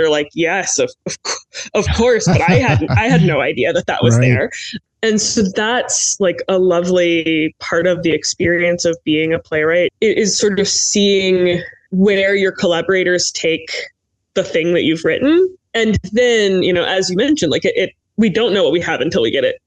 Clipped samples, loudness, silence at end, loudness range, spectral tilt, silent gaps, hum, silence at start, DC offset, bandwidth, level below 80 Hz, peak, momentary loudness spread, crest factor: under 0.1%; -15 LUFS; 0.1 s; 2 LU; -4 dB/octave; none; none; 0 s; under 0.1%; 9.6 kHz; -40 dBFS; 0 dBFS; 7 LU; 14 dB